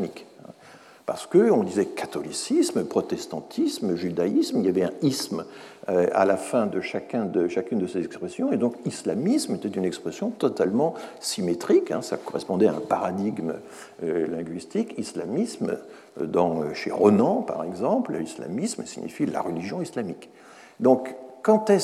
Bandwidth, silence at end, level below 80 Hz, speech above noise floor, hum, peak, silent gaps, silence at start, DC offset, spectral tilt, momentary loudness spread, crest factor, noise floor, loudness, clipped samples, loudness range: 14.5 kHz; 0 s; -74 dBFS; 25 dB; none; -4 dBFS; none; 0 s; under 0.1%; -5.5 dB/octave; 11 LU; 20 dB; -50 dBFS; -25 LUFS; under 0.1%; 4 LU